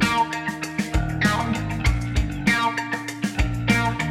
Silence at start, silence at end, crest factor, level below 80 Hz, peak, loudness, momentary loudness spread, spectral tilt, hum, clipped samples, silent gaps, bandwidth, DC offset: 0 s; 0 s; 18 dB; -30 dBFS; -4 dBFS; -23 LUFS; 6 LU; -5 dB/octave; none; under 0.1%; none; 16 kHz; under 0.1%